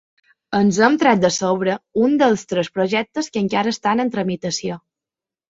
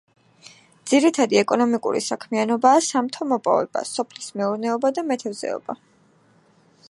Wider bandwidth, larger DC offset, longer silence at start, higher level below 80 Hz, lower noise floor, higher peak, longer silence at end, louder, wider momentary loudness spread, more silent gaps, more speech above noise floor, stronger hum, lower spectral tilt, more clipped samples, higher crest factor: second, 7.8 kHz vs 11.5 kHz; neither; second, 0.5 s vs 0.85 s; first, -60 dBFS vs -76 dBFS; first, -89 dBFS vs -58 dBFS; about the same, -2 dBFS vs -2 dBFS; second, 0.7 s vs 1.15 s; about the same, -19 LUFS vs -21 LUFS; second, 9 LU vs 12 LU; neither; first, 71 dB vs 37 dB; neither; first, -5 dB/octave vs -3.5 dB/octave; neither; about the same, 18 dB vs 20 dB